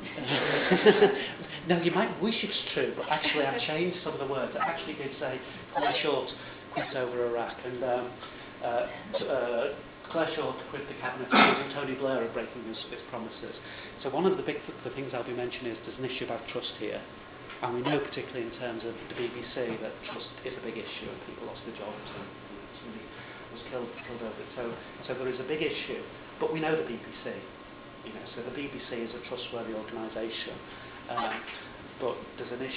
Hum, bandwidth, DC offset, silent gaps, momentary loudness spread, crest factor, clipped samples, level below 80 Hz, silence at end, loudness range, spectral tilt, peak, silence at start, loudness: none; 4 kHz; under 0.1%; none; 15 LU; 24 dB; under 0.1%; -62 dBFS; 0 s; 10 LU; -3 dB/octave; -8 dBFS; 0 s; -32 LUFS